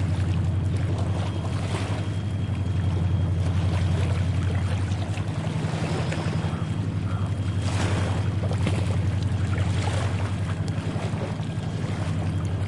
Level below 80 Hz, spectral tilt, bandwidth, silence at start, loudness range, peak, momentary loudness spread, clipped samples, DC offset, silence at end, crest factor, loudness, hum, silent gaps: -46 dBFS; -7 dB/octave; 11 kHz; 0 s; 2 LU; -10 dBFS; 4 LU; under 0.1%; 0.2%; 0 s; 14 dB; -26 LUFS; none; none